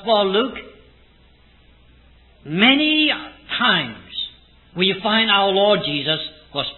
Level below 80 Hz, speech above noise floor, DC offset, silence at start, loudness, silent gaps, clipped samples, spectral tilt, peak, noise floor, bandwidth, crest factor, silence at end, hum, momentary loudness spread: -54 dBFS; 34 dB; under 0.1%; 0 s; -18 LUFS; none; under 0.1%; -8 dB/octave; 0 dBFS; -52 dBFS; 4.3 kHz; 20 dB; 0 s; none; 13 LU